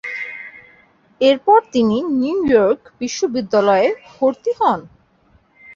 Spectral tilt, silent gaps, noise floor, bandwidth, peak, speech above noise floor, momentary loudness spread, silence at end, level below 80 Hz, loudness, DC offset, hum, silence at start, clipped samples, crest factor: -5 dB/octave; none; -55 dBFS; 7.4 kHz; -2 dBFS; 39 dB; 12 LU; 0 s; -56 dBFS; -17 LUFS; under 0.1%; none; 0.05 s; under 0.1%; 16 dB